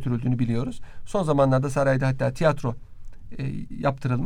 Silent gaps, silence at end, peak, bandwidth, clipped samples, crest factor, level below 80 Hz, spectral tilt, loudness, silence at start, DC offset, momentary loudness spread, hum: none; 0 s; -6 dBFS; 11 kHz; under 0.1%; 18 dB; -42 dBFS; -7.5 dB/octave; -25 LUFS; 0 s; under 0.1%; 13 LU; none